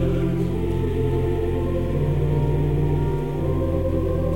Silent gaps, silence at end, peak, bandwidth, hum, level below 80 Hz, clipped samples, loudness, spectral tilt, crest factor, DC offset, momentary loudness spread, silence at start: none; 0 s; -10 dBFS; 16.5 kHz; none; -30 dBFS; under 0.1%; -23 LUFS; -9.5 dB/octave; 12 dB; 2%; 2 LU; 0 s